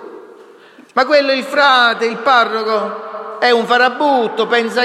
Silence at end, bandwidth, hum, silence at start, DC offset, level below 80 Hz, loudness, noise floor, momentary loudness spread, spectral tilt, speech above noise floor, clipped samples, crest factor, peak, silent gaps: 0 s; 13.5 kHz; none; 0 s; under 0.1%; -66 dBFS; -13 LUFS; -42 dBFS; 8 LU; -3 dB/octave; 29 dB; under 0.1%; 14 dB; 0 dBFS; none